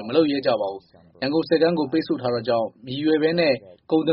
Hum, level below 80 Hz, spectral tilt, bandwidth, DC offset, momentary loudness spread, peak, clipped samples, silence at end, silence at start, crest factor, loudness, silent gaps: none; -64 dBFS; -4.5 dB/octave; 5.6 kHz; under 0.1%; 9 LU; -6 dBFS; under 0.1%; 0 s; 0 s; 16 dB; -22 LUFS; none